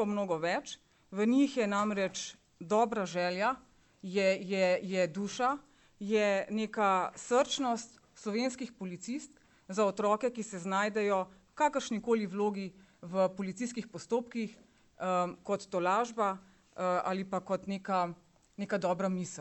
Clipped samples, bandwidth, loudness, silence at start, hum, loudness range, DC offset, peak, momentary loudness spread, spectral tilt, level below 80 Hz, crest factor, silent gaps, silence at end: under 0.1%; 8.4 kHz; -33 LUFS; 0 s; none; 3 LU; under 0.1%; -16 dBFS; 13 LU; -5 dB/octave; -74 dBFS; 18 dB; none; 0 s